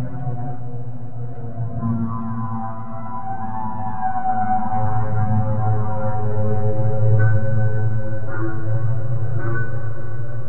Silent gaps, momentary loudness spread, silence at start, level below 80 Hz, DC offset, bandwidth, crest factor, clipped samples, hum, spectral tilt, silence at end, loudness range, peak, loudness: none; 10 LU; 0 s; -42 dBFS; 10%; 2.4 kHz; 14 dB; under 0.1%; none; -11 dB/octave; 0 s; 7 LU; -4 dBFS; -24 LUFS